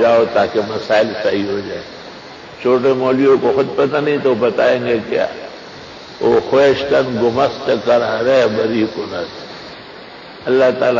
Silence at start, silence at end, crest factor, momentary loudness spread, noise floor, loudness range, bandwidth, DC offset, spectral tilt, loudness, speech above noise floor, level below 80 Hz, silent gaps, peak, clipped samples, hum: 0 s; 0 s; 12 dB; 20 LU; -35 dBFS; 2 LU; 7.6 kHz; under 0.1%; -6 dB/octave; -15 LUFS; 20 dB; -50 dBFS; none; -2 dBFS; under 0.1%; none